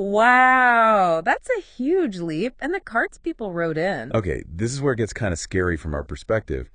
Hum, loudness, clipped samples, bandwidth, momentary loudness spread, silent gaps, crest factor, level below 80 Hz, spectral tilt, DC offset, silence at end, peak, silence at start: none; -21 LUFS; under 0.1%; 10 kHz; 13 LU; none; 18 dB; -42 dBFS; -5.5 dB/octave; under 0.1%; 0.1 s; -2 dBFS; 0 s